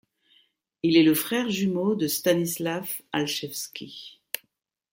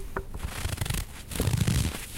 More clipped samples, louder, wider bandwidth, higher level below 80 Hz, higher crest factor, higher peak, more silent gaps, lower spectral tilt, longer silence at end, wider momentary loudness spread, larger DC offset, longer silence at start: neither; first, -25 LUFS vs -30 LUFS; about the same, 17 kHz vs 17 kHz; second, -70 dBFS vs -36 dBFS; about the same, 18 dB vs 18 dB; first, -8 dBFS vs -12 dBFS; neither; about the same, -4.5 dB/octave vs -4.5 dB/octave; first, 0.55 s vs 0 s; first, 16 LU vs 11 LU; neither; first, 0.85 s vs 0 s